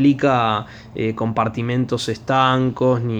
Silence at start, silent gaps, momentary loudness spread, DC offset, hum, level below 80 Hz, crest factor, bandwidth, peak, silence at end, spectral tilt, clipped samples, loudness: 0 s; none; 9 LU; under 0.1%; none; -50 dBFS; 16 dB; 10 kHz; -2 dBFS; 0 s; -6.5 dB/octave; under 0.1%; -19 LUFS